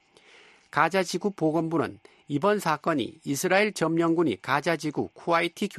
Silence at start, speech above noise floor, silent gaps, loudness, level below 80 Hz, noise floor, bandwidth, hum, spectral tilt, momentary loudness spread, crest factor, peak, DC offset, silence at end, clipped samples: 0.75 s; 30 dB; none; -26 LUFS; -68 dBFS; -55 dBFS; 13 kHz; none; -5 dB/octave; 8 LU; 20 dB; -6 dBFS; under 0.1%; 0 s; under 0.1%